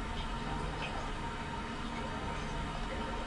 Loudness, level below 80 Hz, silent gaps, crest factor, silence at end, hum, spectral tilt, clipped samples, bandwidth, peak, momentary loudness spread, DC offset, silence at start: -39 LUFS; -42 dBFS; none; 12 dB; 0 s; none; -5 dB/octave; under 0.1%; 11.5 kHz; -26 dBFS; 2 LU; under 0.1%; 0 s